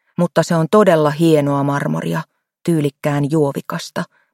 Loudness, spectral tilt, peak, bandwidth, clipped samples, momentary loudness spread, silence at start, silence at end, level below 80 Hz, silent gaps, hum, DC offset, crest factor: -17 LUFS; -6.5 dB/octave; 0 dBFS; 16.5 kHz; under 0.1%; 12 LU; 0.2 s; 0.3 s; -60 dBFS; none; none; under 0.1%; 16 dB